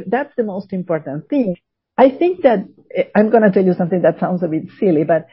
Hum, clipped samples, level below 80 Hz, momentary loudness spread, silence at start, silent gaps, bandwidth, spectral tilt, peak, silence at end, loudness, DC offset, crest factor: none; under 0.1%; -60 dBFS; 10 LU; 0 s; none; 5.6 kHz; -13 dB/octave; 0 dBFS; 0.1 s; -17 LUFS; under 0.1%; 16 dB